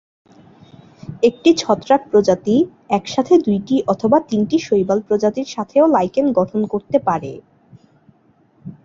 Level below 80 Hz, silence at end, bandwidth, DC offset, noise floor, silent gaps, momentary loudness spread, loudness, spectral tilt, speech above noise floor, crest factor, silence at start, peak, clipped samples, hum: -56 dBFS; 0.1 s; 7.6 kHz; under 0.1%; -55 dBFS; none; 7 LU; -17 LUFS; -6 dB/octave; 39 dB; 16 dB; 1.1 s; -2 dBFS; under 0.1%; none